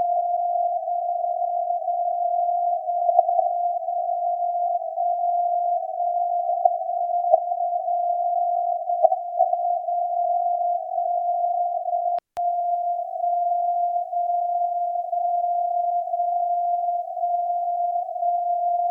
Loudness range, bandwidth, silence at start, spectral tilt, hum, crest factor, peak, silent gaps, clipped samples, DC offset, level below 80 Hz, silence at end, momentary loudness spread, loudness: 1 LU; 1.2 kHz; 0 s; -4.5 dB/octave; none; 20 dB; -2 dBFS; none; under 0.1%; under 0.1%; -84 dBFS; 0 s; 4 LU; -24 LUFS